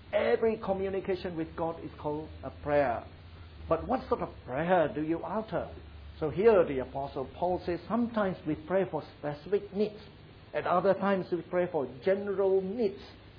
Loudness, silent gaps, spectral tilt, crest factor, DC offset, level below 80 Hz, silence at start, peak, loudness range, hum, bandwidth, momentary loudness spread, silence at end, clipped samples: -31 LUFS; none; -5.5 dB/octave; 18 dB; under 0.1%; -54 dBFS; 0 s; -12 dBFS; 4 LU; none; 5.2 kHz; 12 LU; 0 s; under 0.1%